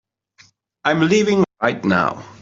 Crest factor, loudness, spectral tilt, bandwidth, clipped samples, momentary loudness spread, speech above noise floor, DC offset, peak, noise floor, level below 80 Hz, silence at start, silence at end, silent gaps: 16 dB; -18 LUFS; -5.5 dB/octave; 7.8 kHz; under 0.1%; 6 LU; 36 dB; under 0.1%; -2 dBFS; -54 dBFS; -58 dBFS; 0.85 s; 0.1 s; none